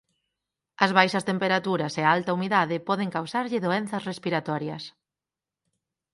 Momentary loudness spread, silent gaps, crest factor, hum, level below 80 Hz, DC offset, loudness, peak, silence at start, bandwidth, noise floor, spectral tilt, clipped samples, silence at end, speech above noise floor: 10 LU; none; 24 dB; none; -72 dBFS; under 0.1%; -25 LUFS; -4 dBFS; 0.8 s; 11.5 kHz; -90 dBFS; -5.5 dB/octave; under 0.1%; 1.25 s; 65 dB